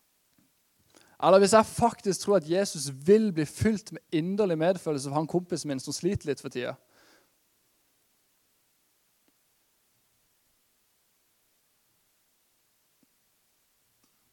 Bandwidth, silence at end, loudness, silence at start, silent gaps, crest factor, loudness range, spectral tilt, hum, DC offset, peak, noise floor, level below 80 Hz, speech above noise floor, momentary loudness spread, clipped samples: 16.5 kHz; 7.55 s; -26 LUFS; 1.2 s; none; 24 dB; 13 LU; -5 dB/octave; none; under 0.1%; -6 dBFS; -71 dBFS; -62 dBFS; 45 dB; 12 LU; under 0.1%